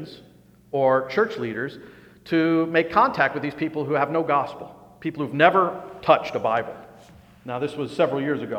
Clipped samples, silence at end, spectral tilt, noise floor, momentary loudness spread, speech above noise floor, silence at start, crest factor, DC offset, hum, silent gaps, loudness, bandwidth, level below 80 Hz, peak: under 0.1%; 0 s; -7 dB/octave; -49 dBFS; 15 LU; 27 dB; 0 s; 22 dB; under 0.1%; 60 Hz at -55 dBFS; none; -23 LUFS; 13.5 kHz; -62 dBFS; 0 dBFS